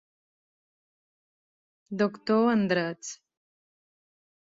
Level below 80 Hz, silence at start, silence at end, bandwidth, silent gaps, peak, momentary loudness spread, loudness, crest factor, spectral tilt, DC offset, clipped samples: -74 dBFS; 1.9 s; 1.45 s; 7.8 kHz; none; -12 dBFS; 17 LU; -26 LUFS; 20 dB; -5.5 dB/octave; under 0.1%; under 0.1%